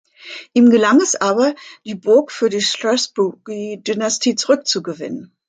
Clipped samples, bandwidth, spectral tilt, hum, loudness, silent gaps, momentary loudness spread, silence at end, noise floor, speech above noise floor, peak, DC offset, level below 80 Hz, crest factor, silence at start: under 0.1%; 9.4 kHz; -3 dB/octave; none; -16 LUFS; none; 15 LU; 0.25 s; -37 dBFS; 20 dB; -2 dBFS; under 0.1%; -68 dBFS; 14 dB; 0.25 s